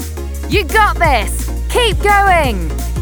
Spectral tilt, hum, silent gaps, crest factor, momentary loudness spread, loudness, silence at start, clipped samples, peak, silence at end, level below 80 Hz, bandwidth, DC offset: -4 dB/octave; none; none; 14 dB; 10 LU; -13 LUFS; 0 s; under 0.1%; 0 dBFS; 0 s; -20 dBFS; over 20 kHz; under 0.1%